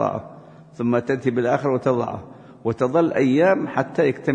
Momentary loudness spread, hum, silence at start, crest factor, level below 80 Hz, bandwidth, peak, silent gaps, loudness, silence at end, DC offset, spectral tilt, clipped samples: 12 LU; none; 0 s; 16 dB; -60 dBFS; 9.4 kHz; -4 dBFS; none; -21 LUFS; 0 s; under 0.1%; -8 dB/octave; under 0.1%